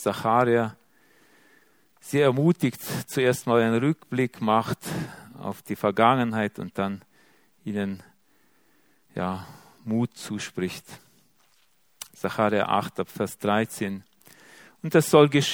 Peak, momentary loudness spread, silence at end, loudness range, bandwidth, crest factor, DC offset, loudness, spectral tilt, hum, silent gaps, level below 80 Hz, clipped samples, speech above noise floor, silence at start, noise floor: -2 dBFS; 17 LU; 0 s; 9 LU; over 20 kHz; 24 dB; under 0.1%; -25 LUFS; -5.5 dB/octave; none; none; -66 dBFS; under 0.1%; 42 dB; 0 s; -66 dBFS